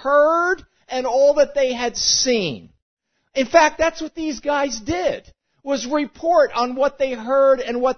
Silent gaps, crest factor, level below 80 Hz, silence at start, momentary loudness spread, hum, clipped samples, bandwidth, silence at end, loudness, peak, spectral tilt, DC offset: 2.82-2.97 s; 18 dB; -50 dBFS; 0 s; 11 LU; none; under 0.1%; 6.6 kHz; 0.05 s; -19 LUFS; 0 dBFS; -2.5 dB/octave; under 0.1%